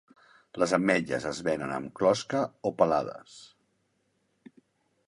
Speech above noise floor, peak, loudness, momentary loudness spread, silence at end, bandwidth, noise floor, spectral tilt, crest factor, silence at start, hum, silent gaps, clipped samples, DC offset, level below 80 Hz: 46 dB; -8 dBFS; -28 LUFS; 14 LU; 1.6 s; 11.5 kHz; -74 dBFS; -5 dB/octave; 22 dB; 0.55 s; none; none; under 0.1%; under 0.1%; -64 dBFS